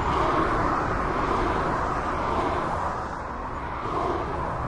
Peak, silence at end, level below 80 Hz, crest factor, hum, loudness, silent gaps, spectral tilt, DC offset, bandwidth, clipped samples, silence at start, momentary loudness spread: -12 dBFS; 0 s; -36 dBFS; 14 dB; none; -26 LUFS; none; -6.5 dB/octave; under 0.1%; 11.5 kHz; under 0.1%; 0 s; 8 LU